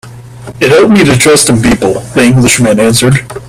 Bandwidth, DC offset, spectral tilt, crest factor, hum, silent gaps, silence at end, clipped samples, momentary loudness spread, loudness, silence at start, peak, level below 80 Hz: over 20 kHz; under 0.1%; -4.5 dB/octave; 8 dB; none; none; 0 s; 0.3%; 5 LU; -6 LUFS; 0.05 s; 0 dBFS; -32 dBFS